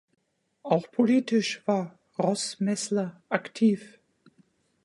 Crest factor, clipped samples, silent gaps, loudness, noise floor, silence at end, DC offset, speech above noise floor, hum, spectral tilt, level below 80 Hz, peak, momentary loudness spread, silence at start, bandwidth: 22 dB; under 0.1%; none; -27 LUFS; -65 dBFS; 0.95 s; under 0.1%; 39 dB; none; -5 dB/octave; -76 dBFS; -6 dBFS; 8 LU; 0.65 s; 11.5 kHz